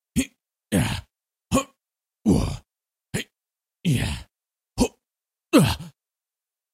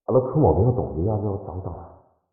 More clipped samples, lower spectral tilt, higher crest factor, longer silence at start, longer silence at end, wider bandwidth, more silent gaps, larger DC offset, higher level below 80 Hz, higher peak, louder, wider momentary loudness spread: neither; second, -5.5 dB/octave vs -17 dB/octave; first, 24 dB vs 16 dB; about the same, 0.15 s vs 0.1 s; first, 0.85 s vs 0.45 s; first, 16 kHz vs 1.6 kHz; neither; neither; about the same, -40 dBFS vs -42 dBFS; first, -2 dBFS vs -6 dBFS; second, -25 LUFS vs -22 LUFS; about the same, 18 LU vs 16 LU